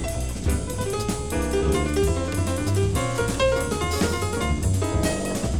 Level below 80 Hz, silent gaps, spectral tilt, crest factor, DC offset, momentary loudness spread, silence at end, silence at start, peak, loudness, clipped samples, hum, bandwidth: -30 dBFS; none; -5 dB/octave; 14 dB; under 0.1%; 4 LU; 0 s; 0 s; -10 dBFS; -24 LUFS; under 0.1%; none; 19 kHz